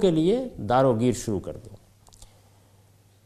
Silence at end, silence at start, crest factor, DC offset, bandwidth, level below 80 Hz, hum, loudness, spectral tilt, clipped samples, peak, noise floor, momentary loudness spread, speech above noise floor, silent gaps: 1 s; 0 s; 18 dB; under 0.1%; 14 kHz; -50 dBFS; none; -24 LUFS; -6.5 dB/octave; under 0.1%; -8 dBFS; -57 dBFS; 15 LU; 34 dB; none